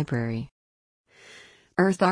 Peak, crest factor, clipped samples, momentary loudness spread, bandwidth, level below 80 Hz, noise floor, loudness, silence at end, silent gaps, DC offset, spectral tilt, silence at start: -8 dBFS; 20 dB; under 0.1%; 25 LU; 10.5 kHz; -60 dBFS; -52 dBFS; -27 LUFS; 0 s; 0.51-1.04 s; under 0.1%; -7 dB/octave; 0 s